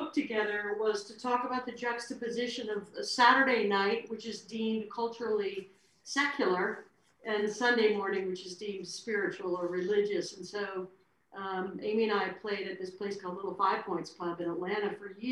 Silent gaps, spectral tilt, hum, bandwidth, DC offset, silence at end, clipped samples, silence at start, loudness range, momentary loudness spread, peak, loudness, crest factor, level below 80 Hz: none; -4 dB/octave; none; 11.5 kHz; under 0.1%; 0 s; under 0.1%; 0 s; 5 LU; 12 LU; -12 dBFS; -32 LUFS; 22 dB; -78 dBFS